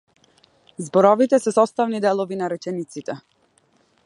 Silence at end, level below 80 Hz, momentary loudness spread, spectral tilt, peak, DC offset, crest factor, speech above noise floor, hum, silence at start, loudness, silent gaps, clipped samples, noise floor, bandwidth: 0.85 s; -74 dBFS; 17 LU; -6 dB/octave; 0 dBFS; under 0.1%; 20 dB; 42 dB; none; 0.8 s; -20 LUFS; none; under 0.1%; -62 dBFS; 11.5 kHz